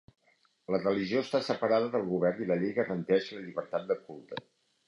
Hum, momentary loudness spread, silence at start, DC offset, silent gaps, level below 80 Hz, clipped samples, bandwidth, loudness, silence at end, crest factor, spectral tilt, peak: none; 15 LU; 0.7 s; under 0.1%; none; -72 dBFS; under 0.1%; 11 kHz; -31 LUFS; 0.5 s; 18 dB; -7 dB/octave; -14 dBFS